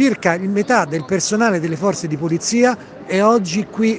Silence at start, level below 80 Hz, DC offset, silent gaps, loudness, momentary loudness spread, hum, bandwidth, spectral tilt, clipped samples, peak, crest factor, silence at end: 0 s; -60 dBFS; under 0.1%; none; -17 LUFS; 6 LU; none; 10 kHz; -4.5 dB/octave; under 0.1%; 0 dBFS; 16 dB; 0 s